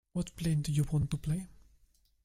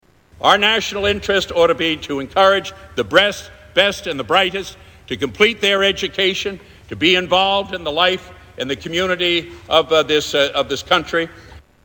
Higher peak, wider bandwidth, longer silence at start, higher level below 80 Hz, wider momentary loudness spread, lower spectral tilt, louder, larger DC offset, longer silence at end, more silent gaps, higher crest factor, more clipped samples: second, -18 dBFS vs 0 dBFS; second, 15.5 kHz vs over 20 kHz; second, 0.15 s vs 0.4 s; about the same, -50 dBFS vs -46 dBFS; second, 7 LU vs 11 LU; first, -6.5 dB/octave vs -3 dB/octave; second, -34 LUFS vs -17 LUFS; neither; first, 0.75 s vs 0.25 s; neither; about the same, 16 dB vs 18 dB; neither